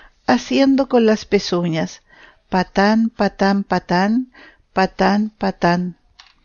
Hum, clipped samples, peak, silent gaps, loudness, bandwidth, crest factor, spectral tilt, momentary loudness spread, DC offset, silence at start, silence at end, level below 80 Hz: none; under 0.1%; 0 dBFS; none; -18 LUFS; 7.2 kHz; 18 dB; -6 dB/octave; 7 LU; under 0.1%; 0.3 s; 0.5 s; -46 dBFS